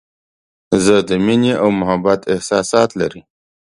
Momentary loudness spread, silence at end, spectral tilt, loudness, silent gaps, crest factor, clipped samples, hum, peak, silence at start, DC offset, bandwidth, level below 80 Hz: 5 LU; 0.6 s; -5 dB/octave; -15 LUFS; none; 16 dB; under 0.1%; none; 0 dBFS; 0.7 s; under 0.1%; 11.5 kHz; -48 dBFS